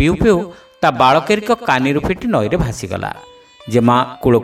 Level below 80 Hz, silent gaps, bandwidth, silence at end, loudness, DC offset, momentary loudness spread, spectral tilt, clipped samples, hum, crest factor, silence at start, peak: -34 dBFS; none; 15 kHz; 0 s; -15 LUFS; under 0.1%; 11 LU; -6 dB/octave; under 0.1%; none; 16 dB; 0 s; 0 dBFS